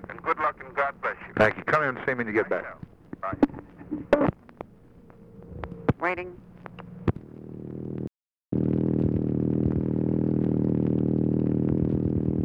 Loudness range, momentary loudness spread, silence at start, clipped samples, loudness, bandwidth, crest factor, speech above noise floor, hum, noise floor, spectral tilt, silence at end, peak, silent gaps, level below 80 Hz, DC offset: 8 LU; 19 LU; 0 s; under 0.1%; -27 LUFS; 7 kHz; 18 dB; 26 dB; none; -52 dBFS; -9.5 dB/octave; 0 s; -10 dBFS; 8.37-8.41 s; -48 dBFS; under 0.1%